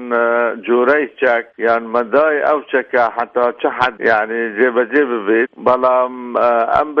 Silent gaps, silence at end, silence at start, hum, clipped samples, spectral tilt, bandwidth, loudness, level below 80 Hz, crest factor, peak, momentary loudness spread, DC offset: none; 0 s; 0 s; none; under 0.1%; -6.5 dB/octave; 6.2 kHz; -15 LUFS; -56 dBFS; 14 dB; 0 dBFS; 4 LU; under 0.1%